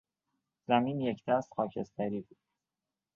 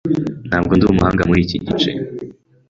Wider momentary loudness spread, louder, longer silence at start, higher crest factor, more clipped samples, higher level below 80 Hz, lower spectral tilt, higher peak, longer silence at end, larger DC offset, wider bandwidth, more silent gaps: second, 8 LU vs 14 LU; second, -33 LUFS vs -16 LUFS; first, 0.7 s vs 0.05 s; first, 24 dB vs 16 dB; neither; second, -74 dBFS vs -34 dBFS; about the same, -7.5 dB/octave vs -7 dB/octave; second, -12 dBFS vs -2 dBFS; first, 0.95 s vs 0.4 s; neither; about the same, 7.2 kHz vs 7.6 kHz; neither